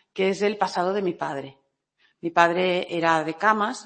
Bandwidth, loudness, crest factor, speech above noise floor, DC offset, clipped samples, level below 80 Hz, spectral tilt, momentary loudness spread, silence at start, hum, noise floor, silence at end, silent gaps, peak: 8.8 kHz; -23 LUFS; 22 dB; 44 dB; under 0.1%; under 0.1%; -70 dBFS; -5 dB/octave; 11 LU; 0.15 s; none; -67 dBFS; 0.05 s; none; -2 dBFS